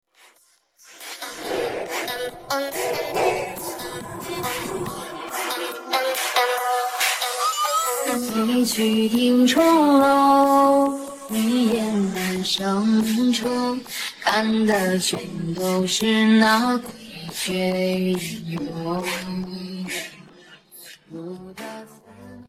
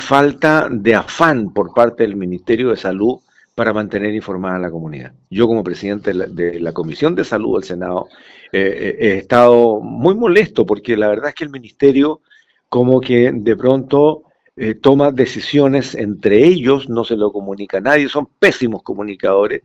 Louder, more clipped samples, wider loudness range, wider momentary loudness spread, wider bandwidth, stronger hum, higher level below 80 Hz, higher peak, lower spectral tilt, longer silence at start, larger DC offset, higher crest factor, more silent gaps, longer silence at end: second, -21 LUFS vs -15 LUFS; second, under 0.1% vs 0.3%; first, 10 LU vs 6 LU; first, 17 LU vs 11 LU; first, 16.5 kHz vs 8.8 kHz; neither; second, -58 dBFS vs -50 dBFS; second, -4 dBFS vs 0 dBFS; second, -4 dB/octave vs -6.5 dB/octave; first, 0.9 s vs 0 s; neither; about the same, 18 dB vs 14 dB; neither; about the same, 0.05 s vs 0.05 s